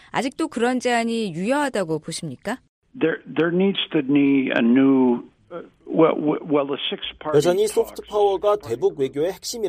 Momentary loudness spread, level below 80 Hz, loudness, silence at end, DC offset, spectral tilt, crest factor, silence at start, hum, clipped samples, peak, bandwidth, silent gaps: 11 LU; -58 dBFS; -21 LUFS; 0 s; under 0.1%; -5 dB/octave; 18 dB; 0.15 s; none; under 0.1%; -4 dBFS; 15.5 kHz; 2.69-2.82 s